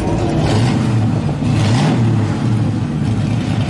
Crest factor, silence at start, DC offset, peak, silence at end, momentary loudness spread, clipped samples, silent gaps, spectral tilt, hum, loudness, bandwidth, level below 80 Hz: 10 dB; 0 s; under 0.1%; -4 dBFS; 0 s; 4 LU; under 0.1%; none; -7 dB/octave; none; -16 LUFS; 11.5 kHz; -34 dBFS